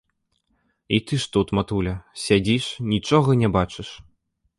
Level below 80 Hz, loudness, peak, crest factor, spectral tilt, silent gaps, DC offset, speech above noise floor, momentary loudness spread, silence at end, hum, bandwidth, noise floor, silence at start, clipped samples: -44 dBFS; -22 LUFS; -4 dBFS; 20 dB; -6 dB/octave; none; under 0.1%; 50 dB; 10 LU; 0.65 s; none; 11.5 kHz; -71 dBFS; 0.9 s; under 0.1%